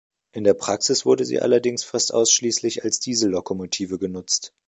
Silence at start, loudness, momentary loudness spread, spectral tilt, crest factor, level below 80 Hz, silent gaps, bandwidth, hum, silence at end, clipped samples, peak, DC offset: 0.35 s; -21 LUFS; 9 LU; -2.5 dB/octave; 18 dB; -60 dBFS; none; 8.2 kHz; none; 0.2 s; under 0.1%; -4 dBFS; under 0.1%